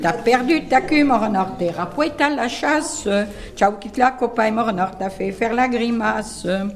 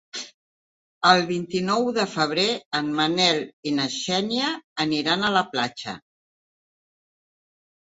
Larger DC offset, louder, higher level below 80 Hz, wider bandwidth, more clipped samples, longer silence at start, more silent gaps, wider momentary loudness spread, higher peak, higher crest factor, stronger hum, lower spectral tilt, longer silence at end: neither; first, -19 LUFS vs -23 LUFS; first, -44 dBFS vs -66 dBFS; first, 14 kHz vs 8 kHz; neither; second, 0 s vs 0.15 s; second, none vs 0.34-1.01 s, 2.66-2.71 s, 3.53-3.63 s, 4.64-4.76 s; second, 7 LU vs 13 LU; about the same, 0 dBFS vs -2 dBFS; second, 18 dB vs 24 dB; neither; about the same, -4.5 dB/octave vs -3.5 dB/octave; second, 0 s vs 1.95 s